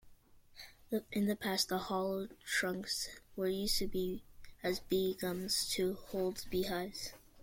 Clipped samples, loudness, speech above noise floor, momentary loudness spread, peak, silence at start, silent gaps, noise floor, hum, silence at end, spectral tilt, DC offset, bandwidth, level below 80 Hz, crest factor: under 0.1%; -37 LUFS; 24 dB; 9 LU; -18 dBFS; 0.05 s; none; -61 dBFS; none; 0 s; -3.5 dB/octave; under 0.1%; 16.5 kHz; -56 dBFS; 18 dB